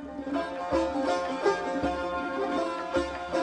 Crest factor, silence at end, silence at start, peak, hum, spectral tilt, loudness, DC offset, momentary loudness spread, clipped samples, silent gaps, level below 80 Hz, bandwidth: 18 dB; 0 s; 0 s; -12 dBFS; none; -5 dB/octave; -30 LUFS; under 0.1%; 4 LU; under 0.1%; none; -50 dBFS; 10 kHz